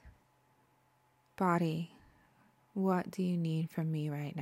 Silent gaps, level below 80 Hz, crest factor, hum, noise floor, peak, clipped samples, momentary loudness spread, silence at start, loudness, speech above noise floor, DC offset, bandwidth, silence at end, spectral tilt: none; -72 dBFS; 18 dB; none; -71 dBFS; -18 dBFS; under 0.1%; 8 LU; 0.05 s; -35 LUFS; 38 dB; under 0.1%; 15.5 kHz; 0 s; -8 dB/octave